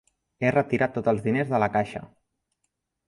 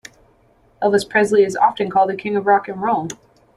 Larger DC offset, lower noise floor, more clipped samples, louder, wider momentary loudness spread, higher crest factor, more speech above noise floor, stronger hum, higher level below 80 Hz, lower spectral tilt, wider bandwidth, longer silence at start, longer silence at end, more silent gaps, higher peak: neither; first, -79 dBFS vs -55 dBFS; neither; second, -25 LUFS vs -17 LUFS; about the same, 6 LU vs 8 LU; about the same, 20 dB vs 16 dB; first, 54 dB vs 38 dB; neither; about the same, -58 dBFS vs -58 dBFS; first, -8 dB/octave vs -5 dB/octave; about the same, 11.5 kHz vs 12 kHz; second, 0.4 s vs 0.8 s; first, 1 s vs 0.4 s; neither; second, -6 dBFS vs -2 dBFS